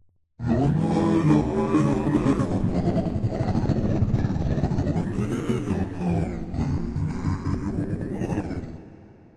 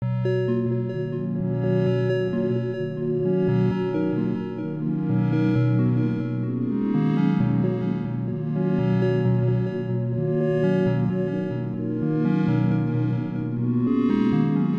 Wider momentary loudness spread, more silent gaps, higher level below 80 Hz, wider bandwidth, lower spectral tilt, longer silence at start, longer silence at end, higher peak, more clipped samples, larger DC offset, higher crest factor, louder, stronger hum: about the same, 7 LU vs 6 LU; neither; first, -38 dBFS vs -54 dBFS; first, 11 kHz vs 5.4 kHz; second, -8.5 dB/octave vs -10.5 dB/octave; first, 0.4 s vs 0 s; first, 0.25 s vs 0 s; first, -6 dBFS vs -10 dBFS; neither; neither; about the same, 18 dB vs 14 dB; about the same, -25 LUFS vs -24 LUFS; neither